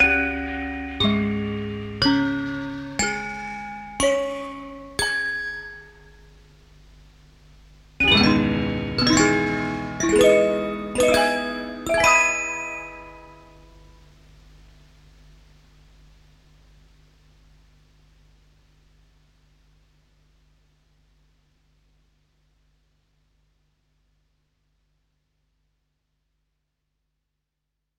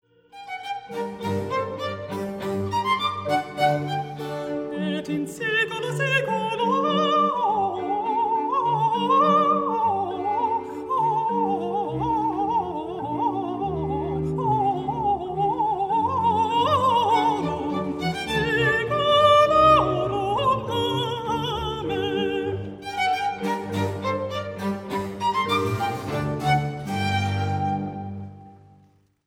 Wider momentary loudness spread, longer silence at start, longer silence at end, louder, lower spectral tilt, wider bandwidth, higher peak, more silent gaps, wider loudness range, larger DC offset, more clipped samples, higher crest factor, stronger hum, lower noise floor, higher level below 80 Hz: first, 17 LU vs 10 LU; second, 0 s vs 0.35 s; first, 14.65 s vs 0.7 s; about the same, -21 LUFS vs -23 LUFS; second, -3.5 dB/octave vs -5.5 dB/octave; about the same, 16.5 kHz vs 16.5 kHz; about the same, -4 dBFS vs -6 dBFS; neither; first, 10 LU vs 6 LU; neither; neither; about the same, 22 dB vs 18 dB; neither; first, -80 dBFS vs -58 dBFS; about the same, -46 dBFS vs -50 dBFS